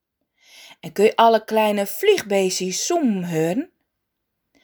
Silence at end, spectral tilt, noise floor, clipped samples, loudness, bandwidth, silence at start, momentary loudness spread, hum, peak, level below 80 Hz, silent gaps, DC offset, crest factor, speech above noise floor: 1 s; -4 dB/octave; -78 dBFS; under 0.1%; -19 LUFS; over 20 kHz; 0.7 s; 11 LU; none; -2 dBFS; -70 dBFS; none; under 0.1%; 18 dB; 59 dB